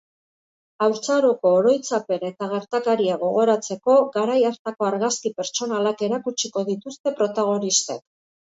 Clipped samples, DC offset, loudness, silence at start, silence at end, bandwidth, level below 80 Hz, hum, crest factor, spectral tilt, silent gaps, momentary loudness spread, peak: under 0.1%; under 0.1%; -22 LUFS; 0.8 s; 0.45 s; 8 kHz; -72 dBFS; none; 16 dB; -3.5 dB/octave; 4.59-4.65 s, 7.00-7.04 s; 8 LU; -6 dBFS